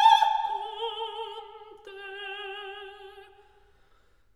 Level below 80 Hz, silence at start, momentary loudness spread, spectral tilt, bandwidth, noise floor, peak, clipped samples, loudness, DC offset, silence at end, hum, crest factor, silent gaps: -68 dBFS; 0 s; 23 LU; 0 dB/octave; 12 kHz; -64 dBFS; -6 dBFS; under 0.1%; -29 LUFS; under 0.1%; 1.15 s; none; 22 dB; none